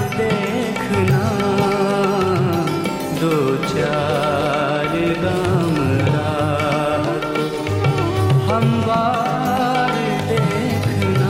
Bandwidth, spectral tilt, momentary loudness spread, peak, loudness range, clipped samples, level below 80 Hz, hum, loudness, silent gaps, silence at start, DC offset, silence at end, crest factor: 16 kHz; -6.5 dB/octave; 3 LU; -6 dBFS; 1 LU; under 0.1%; -44 dBFS; none; -18 LUFS; none; 0 s; under 0.1%; 0 s; 12 dB